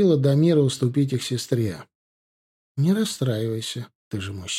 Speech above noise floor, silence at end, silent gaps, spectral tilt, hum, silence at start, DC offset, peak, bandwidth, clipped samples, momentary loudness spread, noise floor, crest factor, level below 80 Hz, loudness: over 68 dB; 0 s; 1.95-2.75 s, 3.95-4.11 s; -6 dB/octave; none; 0 s; under 0.1%; -8 dBFS; 15 kHz; under 0.1%; 15 LU; under -90 dBFS; 16 dB; -62 dBFS; -23 LUFS